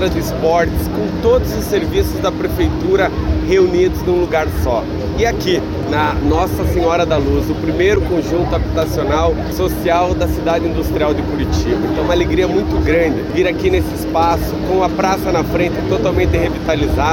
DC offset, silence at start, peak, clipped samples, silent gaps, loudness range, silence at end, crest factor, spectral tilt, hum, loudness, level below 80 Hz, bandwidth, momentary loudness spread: under 0.1%; 0 s; -2 dBFS; under 0.1%; none; 1 LU; 0 s; 12 dB; -6.5 dB/octave; none; -16 LUFS; -24 dBFS; 17 kHz; 4 LU